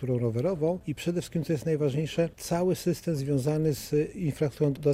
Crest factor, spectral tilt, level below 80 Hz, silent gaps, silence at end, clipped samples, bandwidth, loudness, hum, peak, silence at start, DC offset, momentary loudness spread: 14 dB; -7 dB/octave; -54 dBFS; none; 0 s; under 0.1%; 16 kHz; -29 LUFS; none; -12 dBFS; 0 s; under 0.1%; 4 LU